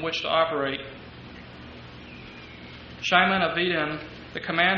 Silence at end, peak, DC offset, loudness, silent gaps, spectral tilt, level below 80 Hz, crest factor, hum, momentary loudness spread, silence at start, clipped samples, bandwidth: 0 s; -4 dBFS; under 0.1%; -24 LUFS; none; -1.5 dB/octave; -54 dBFS; 24 dB; none; 22 LU; 0 s; under 0.1%; 7 kHz